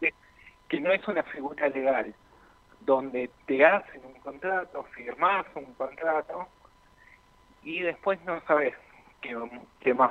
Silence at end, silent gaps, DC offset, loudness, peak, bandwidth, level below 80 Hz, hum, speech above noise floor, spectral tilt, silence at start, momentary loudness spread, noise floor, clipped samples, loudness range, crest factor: 0 s; none; under 0.1%; -28 LUFS; -6 dBFS; 6.6 kHz; -66 dBFS; none; 31 dB; -6.5 dB/octave; 0 s; 16 LU; -59 dBFS; under 0.1%; 5 LU; 24 dB